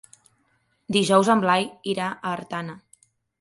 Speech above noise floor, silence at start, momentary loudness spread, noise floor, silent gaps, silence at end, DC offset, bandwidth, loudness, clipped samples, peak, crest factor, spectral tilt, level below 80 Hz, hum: 46 dB; 0.9 s; 14 LU; -68 dBFS; none; 0.65 s; under 0.1%; 11.5 kHz; -23 LUFS; under 0.1%; -4 dBFS; 20 dB; -4.5 dB/octave; -66 dBFS; none